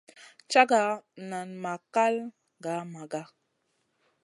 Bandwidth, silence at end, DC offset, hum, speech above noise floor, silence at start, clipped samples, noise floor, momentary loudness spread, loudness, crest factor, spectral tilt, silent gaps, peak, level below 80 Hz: 11.5 kHz; 1 s; under 0.1%; none; 48 dB; 0.2 s; under 0.1%; -76 dBFS; 16 LU; -28 LUFS; 26 dB; -4 dB/octave; none; -4 dBFS; -84 dBFS